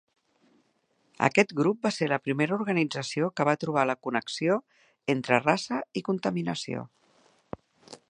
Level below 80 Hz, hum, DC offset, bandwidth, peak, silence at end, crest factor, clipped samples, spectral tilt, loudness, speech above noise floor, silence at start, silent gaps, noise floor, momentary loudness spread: -70 dBFS; none; under 0.1%; 10.5 kHz; -4 dBFS; 0.15 s; 24 dB; under 0.1%; -5.5 dB/octave; -27 LUFS; 44 dB; 1.2 s; none; -71 dBFS; 13 LU